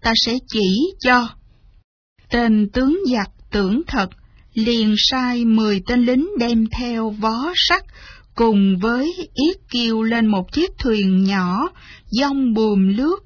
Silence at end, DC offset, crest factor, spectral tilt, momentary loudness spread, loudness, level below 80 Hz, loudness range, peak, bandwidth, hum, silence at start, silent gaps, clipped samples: 0.05 s; under 0.1%; 16 dB; -5.5 dB/octave; 7 LU; -18 LUFS; -40 dBFS; 2 LU; -2 dBFS; 5.4 kHz; none; 0 s; 1.84-2.16 s; under 0.1%